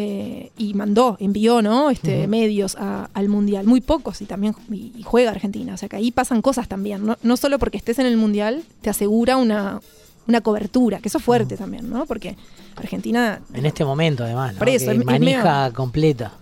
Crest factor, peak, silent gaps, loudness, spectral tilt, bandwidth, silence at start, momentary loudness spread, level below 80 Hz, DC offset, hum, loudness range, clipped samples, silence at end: 16 dB; -4 dBFS; none; -20 LUFS; -6 dB/octave; 16.5 kHz; 0 s; 12 LU; -42 dBFS; under 0.1%; none; 3 LU; under 0.1%; 0.1 s